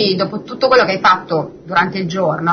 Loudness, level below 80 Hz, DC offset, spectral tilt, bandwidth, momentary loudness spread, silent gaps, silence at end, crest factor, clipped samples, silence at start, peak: -15 LUFS; -52 dBFS; under 0.1%; -5.5 dB/octave; 6.6 kHz; 9 LU; none; 0 s; 14 dB; under 0.1%; 0 s; -2 dBFS